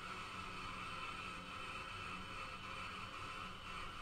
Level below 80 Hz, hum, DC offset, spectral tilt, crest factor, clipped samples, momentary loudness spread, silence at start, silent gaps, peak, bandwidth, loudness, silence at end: -60 dBFS; none; under 0.1%; -3.5 dB/octave; 14 dB; under 0.1%; 2 LU; 0 s; none; -34 dBFS; 15.5 kHz; -47 LUFS; 0 s